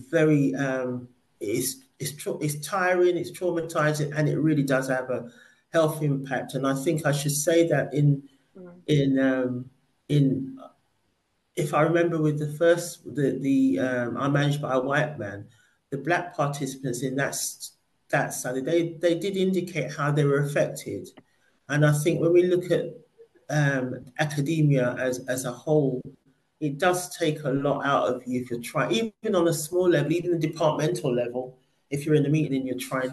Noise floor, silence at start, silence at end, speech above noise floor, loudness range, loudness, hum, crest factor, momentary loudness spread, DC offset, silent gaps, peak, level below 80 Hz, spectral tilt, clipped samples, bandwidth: -73 dBFS; 0 s; 0 s; 48 dB; 3 LU; -25 LUFS; none; 16 dB; 11 LU; under 0.1%; none; -10 dBFS; -66 dBFS; -6 dB/octave; under 0.1%; 12.5 kHz